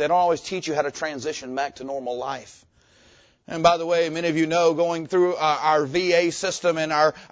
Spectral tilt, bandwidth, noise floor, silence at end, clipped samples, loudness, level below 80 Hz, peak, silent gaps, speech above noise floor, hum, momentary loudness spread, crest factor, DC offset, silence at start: -4 dB/octave; 8 kHz; -56 dBFS; 0.05 s; under 0.1%; -23 LUFS; -60 dBFS; -2 dBFS; none; 34 dB; none; 10 LU; 20 dB; under 0.1%; 0 s